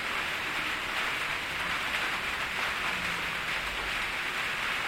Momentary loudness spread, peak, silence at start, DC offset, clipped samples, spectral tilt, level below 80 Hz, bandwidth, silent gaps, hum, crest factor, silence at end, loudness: 1 LU; -14 dBFS; 0 s; under 0.1%; under 0.1%; -1.5 dB/octave; -52 dBFS; 16.5 kHz; none; none; 18 dB; 0 s; -30 LUFS